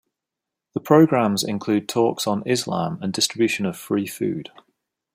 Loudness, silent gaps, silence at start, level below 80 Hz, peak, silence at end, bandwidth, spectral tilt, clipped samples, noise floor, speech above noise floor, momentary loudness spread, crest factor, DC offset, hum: -21 LUFS; none; 0.75 s; -66 dBFS; -2 dBFS; 0.7 s; 16 kHz; -5 dB/octave; under 0.1%; -85 dBFS; 64 dB; 11 LU; 20 dB; under 0.1%; none